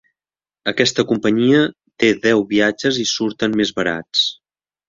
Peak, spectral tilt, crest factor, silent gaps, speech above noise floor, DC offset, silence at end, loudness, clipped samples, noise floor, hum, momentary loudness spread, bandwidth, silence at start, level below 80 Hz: 0 dBFS; -4 dB/octave; 18 dB; none; over 73 dB; under 0.1%; 0.55 s; -17 LUFS; under 0.1%; under -90 dBFS; none; 7 LU; 7.6 kHz; 0.65 s; -56 dBFS